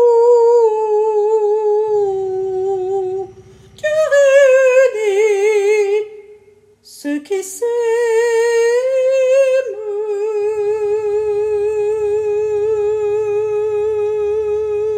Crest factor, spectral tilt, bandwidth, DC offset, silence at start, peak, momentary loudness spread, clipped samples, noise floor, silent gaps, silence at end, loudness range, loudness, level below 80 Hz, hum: 14 dB; -3.5 dB/octave; 14 kHz; under 0.1%; 0 s; -2 dBFS; 10 LU; under 0.1%; -48 dBFS; none; 0 s; 4 LU; -15 LUFS; -56 dBFS; none